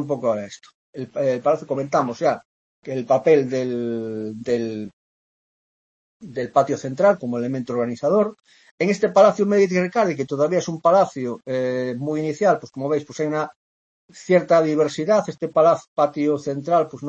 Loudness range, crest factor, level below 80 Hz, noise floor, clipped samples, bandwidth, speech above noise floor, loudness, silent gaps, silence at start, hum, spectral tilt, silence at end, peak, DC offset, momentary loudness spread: 5 LU; 18 dB; -68 dBFS; under -90 dBFS; under 0.1%; 8.2 kHz; over 70 dB; -21 LUFS; 0.74-0.93 s, 2.45-2.82 s, 4.93-6.20 s, 8.71-8.78 s, 13.56-14.08 s, 15.88-15.96 s; 0 s; none; -6.5 dB/octave; 0 s; -2 dBFS; under 0.1%; 12 LU